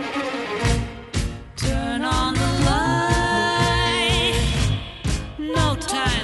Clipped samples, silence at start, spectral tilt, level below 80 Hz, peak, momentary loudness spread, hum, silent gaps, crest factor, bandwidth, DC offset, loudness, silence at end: under 0.1%; 0 s; -4.5 dB/octave; -30 dBFS; -6 dBFS; 8 LU; none; none; 16 dB; 11.5 kHz; under 0.1%; -21 LUFS; 0 s